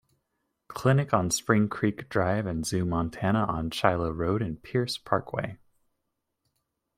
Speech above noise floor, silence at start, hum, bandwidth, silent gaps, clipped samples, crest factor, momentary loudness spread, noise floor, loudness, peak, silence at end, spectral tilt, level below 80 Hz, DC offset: 54 dB; 0.7 s; none; 16 kHz; none; under 0.1%; 22 dB; 6 LU; -81 dBFS; -27 LUFS; -6 dBFS; 1.4 s; -5.5 dB/octave; -52 dBFS; under 0.1%